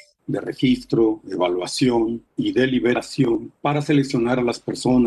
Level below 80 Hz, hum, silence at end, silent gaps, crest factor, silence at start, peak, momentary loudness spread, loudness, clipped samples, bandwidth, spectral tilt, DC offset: -50 dBFS; none; 0 s; none; 14 dB; 0.3 s; -8 dBFS; 6 LU; -21 LUFS; under 0.1%; 12 kHz; -6 dB/octave; under 0.1%